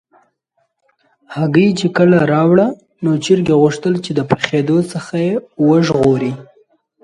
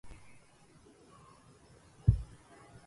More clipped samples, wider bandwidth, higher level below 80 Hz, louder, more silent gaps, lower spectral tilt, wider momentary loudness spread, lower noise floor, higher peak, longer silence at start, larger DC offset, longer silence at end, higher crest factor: neither; about the same, 11.5 kHz vs 11.5 kHz; second, -52 dBFS vs -44 dBFS; first, -14 LUFS vs -33 LUFS; neither; second, -7 dB/octave vs -8.5 dB/octave; second, 9 LU vs 27 LU; first, -66 dBFS vs -61 dBFS; first, 0 dBFS vs -12 dBFS; first, 1.3 s vs 0.05 s; neither; about the same, 0.6 s vs 0.65 s; second, 14 dB vs 26 dB